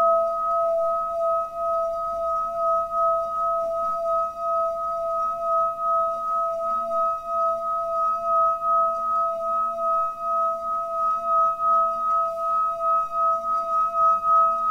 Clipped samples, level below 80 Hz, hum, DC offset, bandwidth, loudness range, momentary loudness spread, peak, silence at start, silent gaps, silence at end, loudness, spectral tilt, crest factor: under 0.1%; -58 dBFS; none; 0.2%; 11 kHz; 3 LU; 5 LU; -12 dBFS; 0 s; none; 0 s; -23 LUFS; -5.5 dB/octave; 12 dB